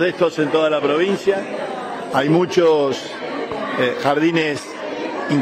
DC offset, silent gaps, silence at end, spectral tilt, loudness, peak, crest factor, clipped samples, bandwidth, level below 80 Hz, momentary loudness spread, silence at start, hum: under 0.1%; none; 0 s; -5.5 dB/octave; -19 LUFS; -4 dBFS; 16 dB; under 0.1%; 14 kHz; -62 dBFS; 11 LU; 0 s; none